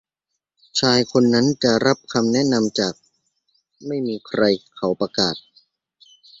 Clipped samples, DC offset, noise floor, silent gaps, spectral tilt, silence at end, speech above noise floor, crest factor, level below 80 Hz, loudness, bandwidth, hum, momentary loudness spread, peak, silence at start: under 0.1%; under 0.1%; -80 dBFS; none; -4.5 dB/octave; 1 s; 61 dB; 18 dB; -58 dBFS; -20 LUFS; 7.8 kHz; none; 9 LU; -2 dBFS; 0.75 s